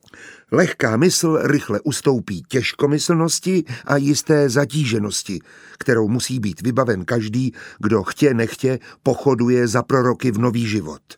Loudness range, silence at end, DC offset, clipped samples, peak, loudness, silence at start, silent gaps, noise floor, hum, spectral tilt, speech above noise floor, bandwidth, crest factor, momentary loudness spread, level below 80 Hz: 2 LU; 0.05 s; under 0.1%; under 0.1%; -2 dBFS; -19 LUFS; 0.15 s; none; -43 dBFS; none; -5 dB/octave; 25 dB; 20 kHz; 18 dB; 7 LU; -56 dBFS